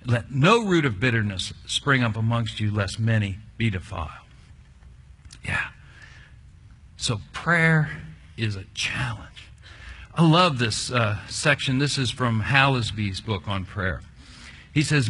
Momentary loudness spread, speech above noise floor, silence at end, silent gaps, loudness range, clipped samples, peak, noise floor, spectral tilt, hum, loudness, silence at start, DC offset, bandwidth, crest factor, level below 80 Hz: 17 LU; 26 dB; 0 s; none; 10 LU; under 0.1%; -2 dBFS; -49 dBFS; -5 dB/octave; none; -23 LUFS; 0.05 s; under 0.1%; 11 kHz; 22 dB; -46 dBFS